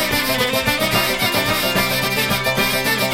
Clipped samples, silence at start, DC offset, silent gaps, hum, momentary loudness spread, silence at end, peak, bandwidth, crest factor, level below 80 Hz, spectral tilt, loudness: under 0.1%; 0 s; under 0.1%; none; none; 1 LU; 0 s; -4 dBFS; 16.5 kHz; 14 dB; -38 dBFS; -3 dB/octave; -17 LUFS